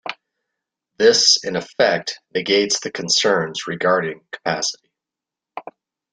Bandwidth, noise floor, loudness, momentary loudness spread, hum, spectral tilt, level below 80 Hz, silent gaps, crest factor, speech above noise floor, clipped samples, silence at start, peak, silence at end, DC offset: 10 kHz; -87 dBFS; -18 LUFS; 21 LU; none; -2 dB/octave; -64 dBFS; none; 20 dB; 68 dB; under 0.1%; 0.05 s; -2 dBFS; 0.5 s; under 0.1%